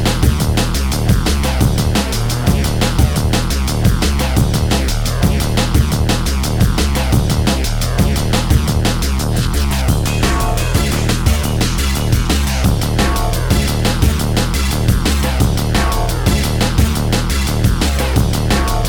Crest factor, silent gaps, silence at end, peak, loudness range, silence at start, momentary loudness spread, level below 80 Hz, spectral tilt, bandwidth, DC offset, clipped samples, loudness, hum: 14 dB; none; 0 s; 0 dBFS; 0 LU; 0 s; 2 LU; -18 dBFS; -5 dB/octave; over 20 kHz; under 0.1%; under 0.1%; -15 LUFS; none